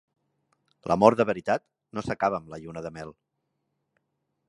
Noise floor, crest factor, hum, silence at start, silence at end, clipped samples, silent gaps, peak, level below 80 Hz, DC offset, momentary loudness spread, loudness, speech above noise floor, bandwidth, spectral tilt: -79 dBFS; 26 dB; none; 0.85 s; 1.35 s; under 0.1%; none; -2 dBFS; -60 dBFS; under 0.1%; 20 LU; -25 LUFS; 53 dB; 11 kHz; -6.5 dB/octave